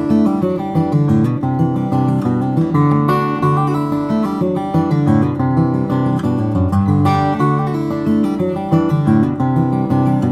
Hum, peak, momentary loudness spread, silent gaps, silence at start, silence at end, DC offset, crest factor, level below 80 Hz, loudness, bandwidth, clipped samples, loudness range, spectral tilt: none; 0 dBFS; 4 LU; none; 0 s; 0 s; under 0.1%; 14 dB; -46 dBFS; -16 LUFS; 12 kHz; under 0.1%; 1 LU; -9.5 dB/octave